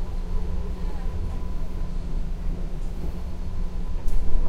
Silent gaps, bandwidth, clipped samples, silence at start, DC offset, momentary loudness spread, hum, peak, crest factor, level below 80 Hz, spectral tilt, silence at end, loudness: none; 5.2 kHz; under 0.1%; 0 s; under 0.1%; 3 LU; none; -6 dBFS; 16 dB; -26 dBFS; -7.5 dB/octave; 0 s; -33 LUFS